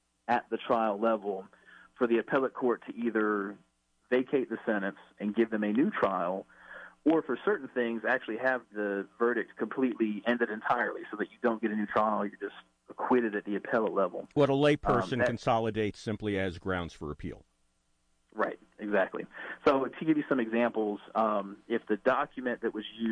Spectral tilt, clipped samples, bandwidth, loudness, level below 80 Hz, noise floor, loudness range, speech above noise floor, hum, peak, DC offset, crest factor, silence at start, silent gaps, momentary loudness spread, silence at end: -7 dB/octave; under 0.1%; 9.8 kHz; -31 LUFS; -60 dBFS; -73 dBFS; 4 LU; 42 dB; none; -14 dBFS; under 0.1%; 16 dB; 0.3 s; none; 10 LU; 0 s